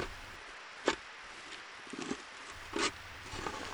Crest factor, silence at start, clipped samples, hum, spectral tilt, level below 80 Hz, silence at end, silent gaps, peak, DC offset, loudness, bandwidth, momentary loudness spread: 28 dB; 0 s; under 0.1%; none; -2.5 dB/octave; -58 dBFS; 0 s; none; -14 dBFS; under 0.1%; -40 LUFS; over 20 kHz; 12 LU